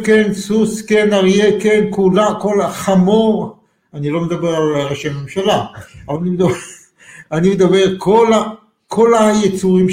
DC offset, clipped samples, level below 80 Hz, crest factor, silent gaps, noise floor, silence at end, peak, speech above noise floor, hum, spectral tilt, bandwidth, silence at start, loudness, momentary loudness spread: under 0.1%; under 0.1%; -48 dBFS; 12 dB; none; -41 dBFS; 0 s; 0 dBFS; 28 dB; none; -6 dB/octave; 16 kHz; 0 s; -14 LUFS; 12 LU